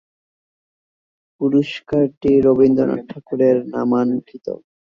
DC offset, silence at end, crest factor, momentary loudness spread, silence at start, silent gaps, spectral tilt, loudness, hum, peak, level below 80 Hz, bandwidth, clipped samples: under 0.1%; 0.35 s; 16 dB; 14 LU; 1.4 s; 2.17-2.21 s; -8.5 dB/octave; -17 LUFS; none; -2 dBFS; -52 dBFS; 6.8 kHz; under 0.1%